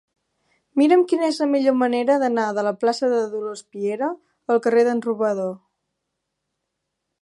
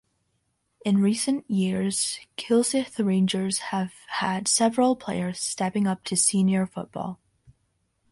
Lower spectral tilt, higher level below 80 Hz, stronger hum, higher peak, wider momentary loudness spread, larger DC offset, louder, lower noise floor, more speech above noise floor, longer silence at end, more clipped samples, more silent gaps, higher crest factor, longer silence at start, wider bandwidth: about the same, -5 dB/octave vs -4 dB/octave; second, -80 dBFS vs -64 dBFS; neither; first, -4 dBFS vs -8 dBFS; about the same, 11 LU vs 10 LU; neither; first, -21 LUFS vs -25 LUFS; first, -79 dBFS vs -74 dBFS; first, 59 dB vs 49 dB; first, 1.65 s vs 1 s; neither; neither; about the same, 16 dB vs 18 dB; about the same, 0.75 s vs 0.85 s; about the same, 11.5 kHz vs 11.5 kHz